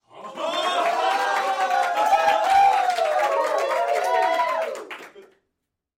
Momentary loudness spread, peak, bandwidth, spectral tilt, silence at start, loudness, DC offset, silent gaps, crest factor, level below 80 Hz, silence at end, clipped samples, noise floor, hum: 13 LU; -8 dBFS; 16.5 kHz; -1 dB/octave; 0.15 s; -21 LUFS; under 0.1%; none; 14 dB; -66 dBFS; 0.75 s; under 0.1%; -80 dBFS; none